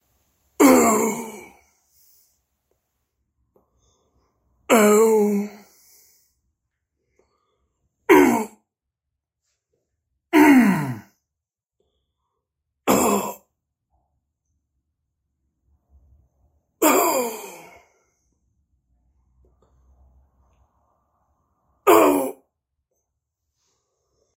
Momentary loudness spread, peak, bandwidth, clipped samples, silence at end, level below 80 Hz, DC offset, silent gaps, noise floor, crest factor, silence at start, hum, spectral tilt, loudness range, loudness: 20 LU; -2 dBFS; 16 kHz; under 0.1%; 2.05 s; -62 dBFS; under 0.1%; none; -86 dBFS; 22 dB; 0.6 s; none; -4.5 dB/octave; 6 LU; -18 LUFS